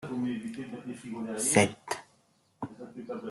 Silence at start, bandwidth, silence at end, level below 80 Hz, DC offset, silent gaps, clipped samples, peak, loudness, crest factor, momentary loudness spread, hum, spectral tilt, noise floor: 0 s; 12.5 kHz; 0 s; -68 dBFS; under 0.1%; none; under 0.1%; -8 dBFS; -31 LUFS; 26 dB; 18 LU; none; -4 dB/octave; -68 dBFS